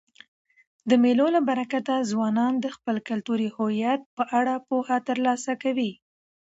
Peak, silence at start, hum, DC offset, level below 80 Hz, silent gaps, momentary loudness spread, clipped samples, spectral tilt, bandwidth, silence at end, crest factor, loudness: -8 dBFS; 0.85 s; none; under 0.1%; -74 dBFS; 4.06-4.17 s; 8 LU; under 0.1%; -5.5 dB/octave; 8 kHz; 0.65 s; 18 dB; -25 LUFS